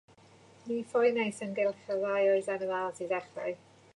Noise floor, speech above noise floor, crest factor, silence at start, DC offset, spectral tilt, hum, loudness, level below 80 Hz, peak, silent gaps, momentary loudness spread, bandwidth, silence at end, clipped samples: -58 dBFS; 27 dB; 16 dB; 0.65 s; under 0.1%; -5 dB/octave; none; -31 LUFS; -78 dBFS; -16 dBFS; none; 11 LU; 11 kHz; 0.4 s; under 0.1%